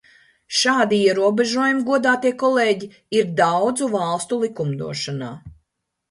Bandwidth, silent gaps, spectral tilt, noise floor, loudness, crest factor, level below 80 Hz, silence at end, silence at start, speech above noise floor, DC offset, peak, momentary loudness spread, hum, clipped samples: 11.5 kHz; none; -4 dB/octave; -75 dBFS; -19 LUFS; 16 dB; -60 dBFS; 0.6 s; 0.5 s; 56 dB; under 0.1%; -4 dBFS; 9 LU; none; under 0.1%